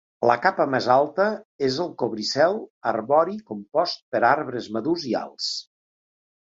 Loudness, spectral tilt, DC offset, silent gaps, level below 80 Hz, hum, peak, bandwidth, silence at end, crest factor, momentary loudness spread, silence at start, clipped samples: -23 LUFS; -4.5 dB/octave; under 0.1%; 1.45-1.59 s, 2.70-2.81 s, 4.02-4.12 s; -66 dBFS; none; -4 dBFS; 7.8 kHz; 0.9 s; 20 dB; 8 LU; 0.2 s; under 0.1%